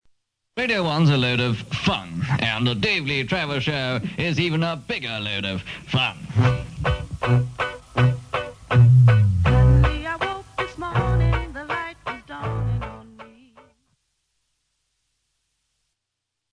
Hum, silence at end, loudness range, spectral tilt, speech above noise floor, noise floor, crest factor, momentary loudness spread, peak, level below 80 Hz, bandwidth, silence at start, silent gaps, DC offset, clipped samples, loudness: none; 3.25 s; 13 LU; -6.5 dB/octave; 59 dB; -81 dBFS; 16 dB; 12 LU; -6 dBFS; -34 dBFS; 10 kHz; 0.55 s; none; under 0.1%; under 0.1%; -22 LUFS